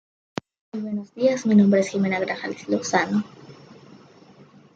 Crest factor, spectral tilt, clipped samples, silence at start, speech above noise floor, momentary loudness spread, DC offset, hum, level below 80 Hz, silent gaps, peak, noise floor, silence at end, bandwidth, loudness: 20 dB; -6 dB/octave; under 0.1%; 0.75 s; 29 dB; 19 LU; under 0.1%; none; -70 dBFS; none; -4 dBFS; -50 dBFS; 0.8 s; 7.8 kHz; -22 LUFS